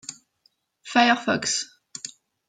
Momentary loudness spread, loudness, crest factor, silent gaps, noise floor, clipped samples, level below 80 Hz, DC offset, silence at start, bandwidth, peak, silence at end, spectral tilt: 19 LU; -22 LUFS; 22 dB; none; -67 dBFS; under 0.1%; -74 dBFS; under 0.1%; 0.1 s; 9.6 kHz; -4 dBFS; 0.4 s; -2 dB/octave